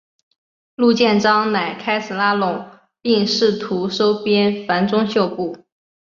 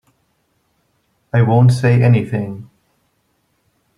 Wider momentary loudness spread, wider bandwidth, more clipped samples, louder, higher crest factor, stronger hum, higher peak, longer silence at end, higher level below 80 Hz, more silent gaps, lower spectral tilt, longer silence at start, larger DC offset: second, 8 LU vs 14 LU; second, 7.2 kHz vs 11 kHz; neither; second, -18 LUFS vs -14 LUFS; about the same, 16 dB vs 16 dB; neither; about the same, -2 dBFS vs -2 dBFS; second, 0.6 s vs 1.35 s; second, -62 dBFS vs -52 dBFS; neither; second, -5.5 dB/octave vs -8.5 dB/octave; second, 0.8 s vs 1.35 s; neither